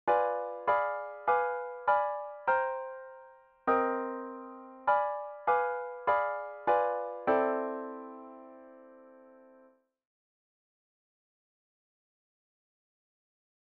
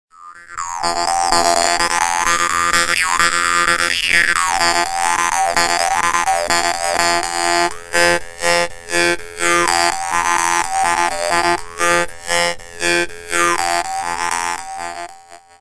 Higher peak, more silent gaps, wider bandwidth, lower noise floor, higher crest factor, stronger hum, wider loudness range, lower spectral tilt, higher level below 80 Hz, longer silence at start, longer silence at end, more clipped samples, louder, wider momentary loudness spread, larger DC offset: second, -14 dBFS vs 0 dBFS; neither; second, 5 kHz vs 11 kHz; first, -64 dBFS vs -41 dBFS; about the same, 20 dB vs 18 dB; neither; first, 6 LU vs 3 LU; first, -7 dB/octave vs -1 dB/octave; second, -76 dBFS vs -42 dBFS; second, 0.05 s vs 0.2 s; first, 4.35 s vs 0.25 s; neither; second, -31 LUFS vs -16 LUFS; first, 16 LU vs 7 LU; neither